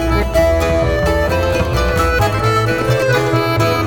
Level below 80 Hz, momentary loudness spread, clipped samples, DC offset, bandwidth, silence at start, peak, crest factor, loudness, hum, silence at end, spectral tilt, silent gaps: -22 dBFS; 2 LU; under 0.1%; under 0.1%; 19 kHz; 0 s; 0 dBFS; 14 dB; -15 LUFS; none; 0 s; -6 dB/octave; none